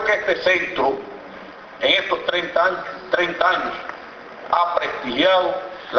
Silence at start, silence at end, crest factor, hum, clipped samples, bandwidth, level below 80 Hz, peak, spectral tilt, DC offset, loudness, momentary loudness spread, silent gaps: 0 s; 0 s; 18 dB; none; under 0.1%; 6.8 kHz; -56 dBFS; -2 dBFS; -3.5 dB/octave; under 0.1%; -20 LUFS; 19 LU; none